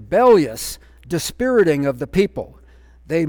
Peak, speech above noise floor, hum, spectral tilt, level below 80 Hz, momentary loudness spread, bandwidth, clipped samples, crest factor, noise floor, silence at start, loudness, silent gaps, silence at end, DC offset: -4 dBFS; 29 dB; none; -5.5 dB/octave; -44 dBFS; 17 LU; over 20 kHz; under 0.1%; 14 dB; -46 dBFS; 0 s; -18 LUFS; none; 0 s; under 0.1%